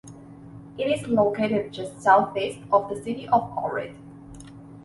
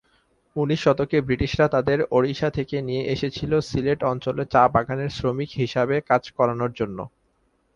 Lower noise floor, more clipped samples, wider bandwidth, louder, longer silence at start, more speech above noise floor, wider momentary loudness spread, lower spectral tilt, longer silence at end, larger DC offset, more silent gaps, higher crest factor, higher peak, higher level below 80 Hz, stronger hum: second, -44 dBFS vs -67 dBFS; neither; first, 11.5 kHz vs 7.6 kHz; about the same, -24 LUFS vs -23 LUFS; second, 0.05 s vs 0.55 s; second, 20 dB vs 44 dB; first, 25 LU vs 8 LU; about the same, -6 dB/octave vs -7 dB/octave; second, 0.05 s vs 0.7 s; neither; neither; about the same, 20 dB vs 20 dB; about the same, -4 dBFS vs -4 dBFS; second, -58 dBFS vs -46 dBFS; neither